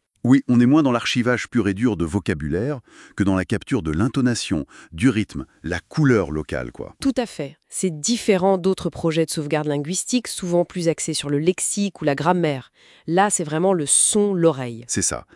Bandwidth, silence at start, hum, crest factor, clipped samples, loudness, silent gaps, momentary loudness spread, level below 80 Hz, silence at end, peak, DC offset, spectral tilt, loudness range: 12 kHz; 0.25 s; none; 18 dB; under 0.1%; -21 LUFS; none; 12 LU; -48 dBFS; 0.15 s; -4 dBFS; under 0.1%; -4.5 dB/octave; 4 LU